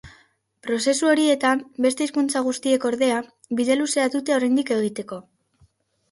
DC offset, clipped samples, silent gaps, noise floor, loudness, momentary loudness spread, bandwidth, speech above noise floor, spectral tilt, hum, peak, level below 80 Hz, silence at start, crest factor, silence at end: under 0.1%; under 0.1%; none; -61 dBFS; -22 LUFS; 10 LU; 11.5 kHz; 39 dB; -3 dB/octave; none; -6 dBFS; -64 dBFS; 0.05 s; 16 dB; 0.9 s